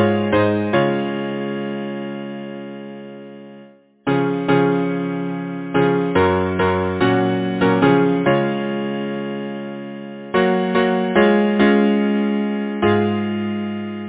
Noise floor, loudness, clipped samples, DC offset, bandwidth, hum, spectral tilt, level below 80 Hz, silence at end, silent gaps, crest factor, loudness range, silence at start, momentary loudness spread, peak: -45 dBFS; -19 LUFS; under 0.1%; under 0.1%; 4 kHz; none; -11 dB/octave; -46 dBFS; 0 s; none; 16 dB; 7 LU; 0 s; 15 LU; -2 dBFS